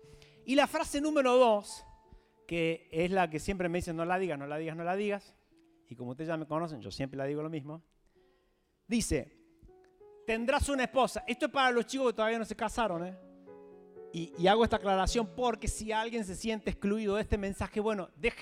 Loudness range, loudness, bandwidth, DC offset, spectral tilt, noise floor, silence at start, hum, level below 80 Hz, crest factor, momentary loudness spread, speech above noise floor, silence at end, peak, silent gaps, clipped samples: 8 LU; -32 LUFS; 16 kHz; under 0.1%; -4.5 dB/octave; -73 dBFS; 0.1 s; none; -48 dBFS; 20 dB; 14 LU; 41 dB; 0 s; -12 dBFS; none; under 0.1%